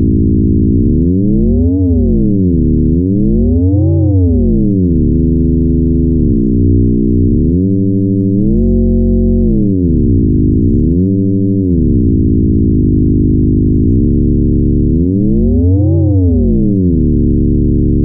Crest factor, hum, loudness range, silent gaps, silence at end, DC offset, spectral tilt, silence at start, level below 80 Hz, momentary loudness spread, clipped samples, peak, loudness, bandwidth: 8 dB; none; 0 LU; none; 0 s; under 0.1%; -18 dB/octave; 0 s; -16 dBFS; 1 LU; under 0.1%; -2 dBFS; -11 LUFS; 0.9 kHz